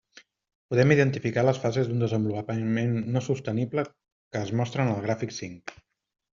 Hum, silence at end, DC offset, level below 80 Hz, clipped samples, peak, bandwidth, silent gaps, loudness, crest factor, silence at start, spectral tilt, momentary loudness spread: none; 0.6 s; under 0.1%; -62 dBFS; under 0.1%; -6 dBFS; 7.4 kHz; 4.12-4.31 s; -27 LUFS; 20 dB; 0.7 s; -6.5 dB/octave; 14 LU